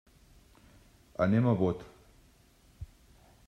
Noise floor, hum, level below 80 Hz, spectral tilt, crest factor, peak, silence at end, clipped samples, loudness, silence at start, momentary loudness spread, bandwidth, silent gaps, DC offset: -62 dBFS; none; -58 dBFS; -9 dB/octave; 20 dB; -14 dBFS; 0.6 s; under 0.1%; -29 LUFS; 1.2 s; 24 LU; 9.8 kHz; none; under 0.1%